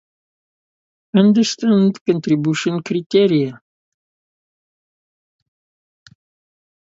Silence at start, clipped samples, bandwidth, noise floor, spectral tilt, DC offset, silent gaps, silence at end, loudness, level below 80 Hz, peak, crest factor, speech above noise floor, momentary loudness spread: 1.15 s; under 0.1%; 7.8 kHz; under -90 dBFS; -6 dB/octave; under 0.1%; 2.01-2.05 s, 3.06-3.10 s; 3.35 s; -17 LUFS; -66 dBFS; 0 dBFS; 20 dB; over 75 dB; 7 LU